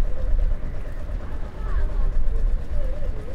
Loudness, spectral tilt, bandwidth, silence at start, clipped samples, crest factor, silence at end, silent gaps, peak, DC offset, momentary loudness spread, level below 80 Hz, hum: -30 LUFS; -8 dB/octave; 3.3 kHz; 0 s; under 0.1%; 12 dB; 0 s; none; -8 dBFS; under 0.1%; 6 LU; -22 dBFS; none